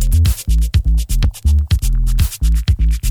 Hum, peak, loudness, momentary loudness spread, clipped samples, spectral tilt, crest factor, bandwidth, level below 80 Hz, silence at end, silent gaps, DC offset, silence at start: none; -4 dBFS; -17 LUFS; 3 LU; under 0.1%; -5 dB/octave; 10 dB; 19.5 kHz; -14 dBFS; 0 s; none; under 0.1%; 0 s